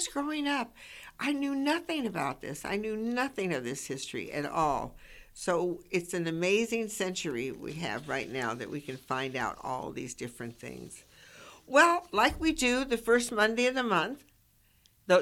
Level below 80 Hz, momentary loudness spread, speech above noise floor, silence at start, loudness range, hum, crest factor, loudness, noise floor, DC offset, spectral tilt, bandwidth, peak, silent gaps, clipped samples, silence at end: -56 dBFS; 16 LU; 34 dB; 0 s; 9 LU; none; 22 dB; -31 LUFS; -66 dBFS; under 0.1%; -4 dB/octave; 17 kHz; -8 dBFS; none; under 0.1%; 0 s